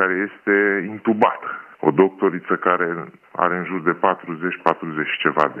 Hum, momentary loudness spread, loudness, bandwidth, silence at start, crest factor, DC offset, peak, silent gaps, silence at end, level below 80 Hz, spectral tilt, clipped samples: none; 8 LU; -20 LUFS; 5.8 kHz; 0 s; 20 dB; under 0.1%; 0 dBFS; none; 0 s; -72 dBFS; -8 dB/octave; under 0.1%